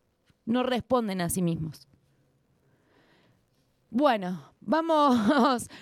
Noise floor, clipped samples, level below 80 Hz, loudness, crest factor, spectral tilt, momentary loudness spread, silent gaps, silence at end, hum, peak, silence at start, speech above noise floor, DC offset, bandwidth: -69 dBFS; under 0.1%; -60 dBFS; -26 LUFS; 18 dB; -5.5 dB/octave; 13 LU; none; 0 s; none; -10 dBFS; 0.45 s; 43 dB; under 0.1%; 15.5 kHz